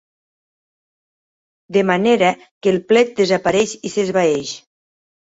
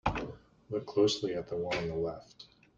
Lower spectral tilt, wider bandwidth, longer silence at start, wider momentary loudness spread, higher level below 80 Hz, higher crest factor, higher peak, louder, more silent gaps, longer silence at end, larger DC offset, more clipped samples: about the same, -4.5 dB/octave vs -5 dB/octave; about the same, 8 kHz vs 7.8 kHz; first, 1.7 s vs 0.05 s; second, 7 LU vs 18 LU; second, -58 dBFS vs -52 dBFS; about the same, 18 dB vs 20 dB; first, -2 dBFS vs -14 dBFS; first, -17 LUFS vs -33 LUFS; first, 2.51-2.61 s vs none; first, 0.65 s vs 0.3 s; neither; neither